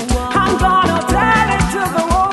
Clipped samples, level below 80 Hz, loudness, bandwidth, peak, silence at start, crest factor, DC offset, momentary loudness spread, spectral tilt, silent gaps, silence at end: under 0.1%; -24 dBFS; -14 LUFS; 12.5 kHz; -2 dBFS; 0 s; 12 dB; under 0.1%; 4 LU; -5 dB/octave; none; 0 s